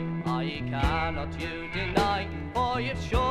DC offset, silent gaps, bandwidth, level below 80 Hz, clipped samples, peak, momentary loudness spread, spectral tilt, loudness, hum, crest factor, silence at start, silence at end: under 0.1%; none; 14 kHz; -38 dBFS; under 0.1%; -8 dBFS; 6 LU; -6 dB/octave; -29 LUFS; none; 20 dB; 0 s; 0 s